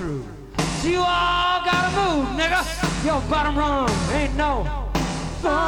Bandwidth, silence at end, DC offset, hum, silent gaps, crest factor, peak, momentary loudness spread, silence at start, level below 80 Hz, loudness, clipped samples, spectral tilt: 18.5 kHz; 0 s; under 0.1%; none; none; 12 dB; -8 dBFS; 7 LU; 0 s; -32 dBFS; -22 LUFS; under 0.1%; -4.5 dB/octave